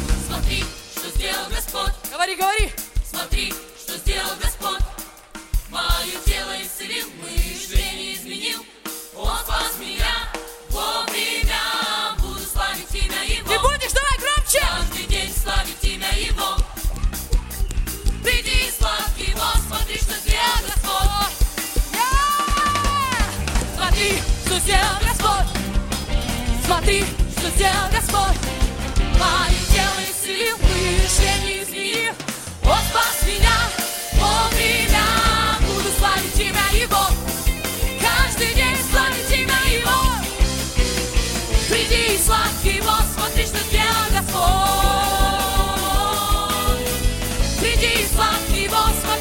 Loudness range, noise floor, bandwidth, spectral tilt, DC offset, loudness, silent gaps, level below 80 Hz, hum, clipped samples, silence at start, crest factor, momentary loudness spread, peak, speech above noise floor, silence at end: 7 LU; -39 dBFS; 17 kHz; -3 dB/octave; under 0.1%; -20 LUFS; none; -24 dBFS; none; under 0.1%; 0 s; 18 dB; 9 LU; -2 dBFS; 21 dB; 0 s